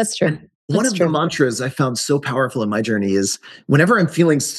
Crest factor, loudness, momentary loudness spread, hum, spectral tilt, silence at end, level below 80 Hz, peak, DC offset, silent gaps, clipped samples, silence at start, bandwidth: 16 dB; -18 LUFS; 6 LU; none; -5 dB/octave; 0 s; -62 dBFS; -2 dBFS; under 0.1%; 0.55-0.68 s; under 0.1%; 0 s; 12.5 kHz